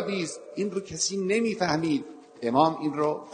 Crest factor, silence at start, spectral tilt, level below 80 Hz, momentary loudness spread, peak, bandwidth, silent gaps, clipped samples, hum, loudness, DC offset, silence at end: 20 dB; 0 s; -4 dB/octave; -64 dBFS; 9 LU; -8 dBFS; 9.4 kHz; none; under 0.1%; none; -27 LUFS; under 0.1%; 0 s